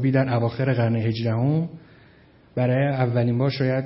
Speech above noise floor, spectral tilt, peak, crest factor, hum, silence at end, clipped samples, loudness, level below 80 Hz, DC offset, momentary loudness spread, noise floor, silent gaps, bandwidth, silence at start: 31 dB; -12 dB/octave; -6 dBFS; 16 dB; none; 0 s; under 0.1%; -23 LUFS; -60 dBFS; under 0.1%; 5 LU; -53 dBFS; none; 5.8 kHz; 0 s